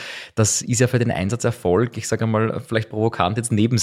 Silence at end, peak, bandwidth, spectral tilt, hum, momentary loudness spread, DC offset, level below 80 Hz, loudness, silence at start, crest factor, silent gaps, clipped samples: 0 s; -2 dBFS; 15 kHz; -5 dB/octave; none; 5 LU; under 0.1%; -52 dBFS; -21 LUFS; 0 s; 18 dB; none; under 0.1%